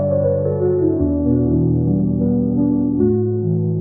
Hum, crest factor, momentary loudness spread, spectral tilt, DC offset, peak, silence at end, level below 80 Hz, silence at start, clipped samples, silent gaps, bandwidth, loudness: none; 12 dB; 2 LU; -16.5 dB/octave; 0.3%; -6 dBFS; 0 s; -38 dBFS; 0 s; under 0.1%; none; 1.9 kHz; -17 LUFS